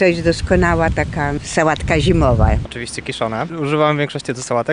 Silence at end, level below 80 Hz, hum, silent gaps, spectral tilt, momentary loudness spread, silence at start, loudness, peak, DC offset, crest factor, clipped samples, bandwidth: 0 s; -26 dBFS; none; none; -6 dB/octave; 8 LU; 0 s; -17 LUFS; -2 dBFS; 0.2%; 14 dB; under 0.1%; 10.5 kHz